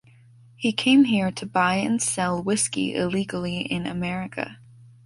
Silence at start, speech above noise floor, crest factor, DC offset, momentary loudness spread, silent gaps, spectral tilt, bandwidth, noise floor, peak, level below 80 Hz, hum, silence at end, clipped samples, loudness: 0.6 s; 29 dB; 16 dB; under 0.1%; 11 LU; none; -4 dB/octave; 11.5 kHz; -52 dBFS; -8 dBFS; -56 dBFS; none; 0.2 s; under 0.1%; -23 LUFS